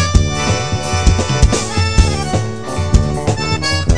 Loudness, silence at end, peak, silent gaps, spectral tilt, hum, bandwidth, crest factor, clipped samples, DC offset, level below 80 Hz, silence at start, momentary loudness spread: -16 LUFS; 0 s; 0 dBFS; none; -4.5 dB/octave; none; 11 kHz; 14 dB; 0.3%; 3%; -18 dBFS; 0 s; 4 LU